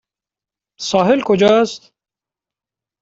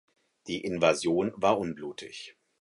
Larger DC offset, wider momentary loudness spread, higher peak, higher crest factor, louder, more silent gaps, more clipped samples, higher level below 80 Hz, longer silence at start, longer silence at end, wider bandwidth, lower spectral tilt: neither; second, 13 LU vs 18 LU; first, -2 dBFS vs -10 dBFS; about the same, 16 dB vs 20 dB; first, -14 LUFS vs -28 LUFS; neither; neither; first, -58 dBFS vs -64 dBFS; first, 0.8 s vs 0.45 s; first, 1.25 s vs 0.3 s; second, 8 kHz vs 11.5 kHz; about the same, -5 dB/octave vs -4.5 dB/octave